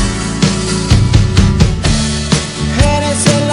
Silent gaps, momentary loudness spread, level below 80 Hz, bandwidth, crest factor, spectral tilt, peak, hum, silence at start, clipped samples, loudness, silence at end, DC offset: none; 4 LU; -18 dBFS; 11 kHz; 12 dB; -5 dB/octave; 0 dBFS; none; 0 s; 0.4%; -12 LUFS; 0 s; under 0.1%